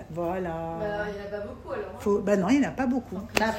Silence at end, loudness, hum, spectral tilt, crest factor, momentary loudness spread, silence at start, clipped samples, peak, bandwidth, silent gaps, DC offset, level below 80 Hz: 0 s; -28 LUFS; none; -5.5 dB/octave; 24 dB; 12 LU; 0 s; under 0.1%; -2 dBFS; 16 kHz; none; under 0.1%; -50 dBFS